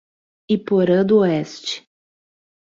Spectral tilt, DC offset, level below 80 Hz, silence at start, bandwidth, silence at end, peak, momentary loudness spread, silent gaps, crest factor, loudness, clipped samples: -6.5 dB/octave; under 0.1%; -62 dBFS; 0.5 s; 7.6 kHz; 0.9 s; -4 dBFS; 13 LU; none; 16 dB; -19 LUFS; under 0.1%